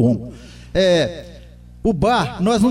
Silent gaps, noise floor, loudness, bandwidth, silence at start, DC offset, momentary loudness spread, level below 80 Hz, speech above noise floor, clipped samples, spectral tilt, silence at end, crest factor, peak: none; -40 dBFS; -18 LUFS; 13.5 kHz; 0 s; under 0.1%; 19 LU; -38 dBFS; 23 dB; under 0.1%; -6 dB/octave; 0 s; 14 dB; -4 dBFS